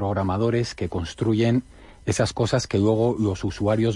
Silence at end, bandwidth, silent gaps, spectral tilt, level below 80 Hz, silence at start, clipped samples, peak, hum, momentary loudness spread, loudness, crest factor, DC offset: 0 s; 11.5 kHz; none; -6.5 dB/octave; -46 dBFS; 0 s; under 0.1%; -6 dBFS; none; 7 LU; -23 LUFS; 16 dB; under 0.1%